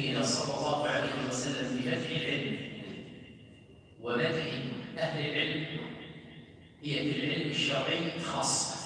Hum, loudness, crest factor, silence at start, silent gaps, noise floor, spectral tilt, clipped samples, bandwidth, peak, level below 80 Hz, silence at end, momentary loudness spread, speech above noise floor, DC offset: none; -32 LUFS; 18 dB; 0 s; none; -55 dBFS; -3.5 dB/octave; under 0.1%; 10.5 kHz; -16 dBFS; -66 dBFS; 0 s; 16 LU; 23 dB; under 0.1%